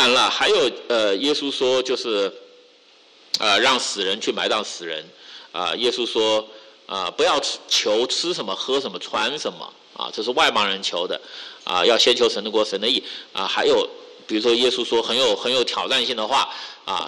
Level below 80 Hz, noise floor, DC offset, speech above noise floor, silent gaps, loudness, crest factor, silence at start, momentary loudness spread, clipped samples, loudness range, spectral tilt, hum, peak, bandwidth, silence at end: -64 dBFS; -52 dBFS; under 0.1%; 31 dB; none; -20 LUFS; 16 dB; 0 s; 13 LU; under 0.1%; 3 LU; -1.5 dB/octave; none; -6 dBFS; 11.5 kHz; 0 s